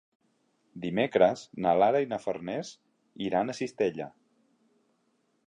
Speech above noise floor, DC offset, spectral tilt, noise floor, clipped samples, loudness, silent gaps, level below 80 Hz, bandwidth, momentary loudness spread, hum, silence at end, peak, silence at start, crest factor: 45 dB; under 0.1%; -6 dB/octave; -73 dBFS; under 0.1%; -28 LUFS; none; -70 dBFS; 10 kHz; 14 LU; none; 1.4 s; -8 dBFS; 0.75 s; 22 dB